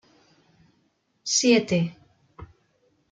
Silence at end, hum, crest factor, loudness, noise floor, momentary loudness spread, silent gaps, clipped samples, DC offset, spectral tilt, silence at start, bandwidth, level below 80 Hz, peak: 0.65 s; none; 20 dB; -22 LUFS; -69 dBFS; 13 LU; none; under 0.1%; under 0.1%; -3.5 dB/octave; 1.25 s; 9.6 kHz; -62 dBFS; -8 dBFS